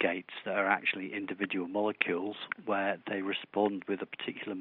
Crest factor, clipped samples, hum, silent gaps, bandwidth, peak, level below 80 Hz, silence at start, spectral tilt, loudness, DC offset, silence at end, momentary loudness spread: 26 dB; under 0.1%; none; none; 4.4 kHz; -8 dBFS; -82 dBFS; 0 s; -2.5 dB/octave; -33 LUFS; under 0.1%; 0 s; 8 LU